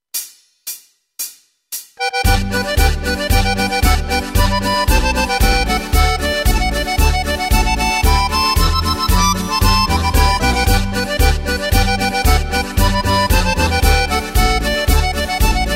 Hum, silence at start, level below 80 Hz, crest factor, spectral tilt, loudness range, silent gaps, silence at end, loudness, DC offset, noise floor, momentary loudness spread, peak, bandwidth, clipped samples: none; 0.15 s; -18 dBFS; 14 dB; -4 dB/octave; 3 LU; none; 0 s; -15 LUFS; under 0.1%; -35 dBFS; 7 LU; 0 dBFS; 16.5 kHz; under 0.1%